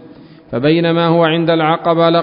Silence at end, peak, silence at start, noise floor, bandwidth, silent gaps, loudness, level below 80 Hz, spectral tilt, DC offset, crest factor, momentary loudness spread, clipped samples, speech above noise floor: 0 s; 0 dBFS; 0.5 s; -39 dBFS; 5.4 kHz; none; -13 LUFS; -54 dBFS; -12 dB/octave; under 0.1%; 14 dB; 4 LU; under 0.1%; 26 dB